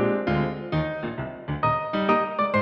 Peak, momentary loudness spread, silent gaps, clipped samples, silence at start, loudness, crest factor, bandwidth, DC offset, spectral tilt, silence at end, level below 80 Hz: -8 dBFS; 9 LU; none; under 0.1%; 0 s; -25 LUFS; 16 dB; 6.2 kHz; under 0.1%; -9 dB/octave; 0 s; -46 dBFS